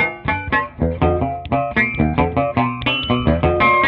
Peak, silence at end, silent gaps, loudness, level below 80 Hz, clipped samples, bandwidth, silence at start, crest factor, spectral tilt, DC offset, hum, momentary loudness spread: -2 dBFS; 0 s; none; -18 LUFS; -30 dBFS; under 0.1%; 5.4 kHz; 0 s; 16 dB; -8.5 dB/octave; under 0.1%; none; 5 LU